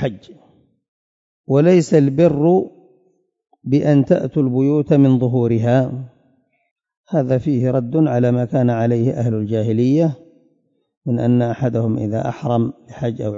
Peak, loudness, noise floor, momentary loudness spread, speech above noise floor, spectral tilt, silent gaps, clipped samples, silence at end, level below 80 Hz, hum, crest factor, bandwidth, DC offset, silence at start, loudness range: -2 dBFS; -17 LUFS; -64 dBFS; 10 LU; 48 dB; -9 dB/octave; 0.88-1.44 s, 6.71-6.76 s, 6.97-7.04 s, 10.97-11.01 s; under 0.1%; 0 s; -54 dBFS; none; 16 dB; 7.8 kHz; under 0.1%; 0 s; 3 LU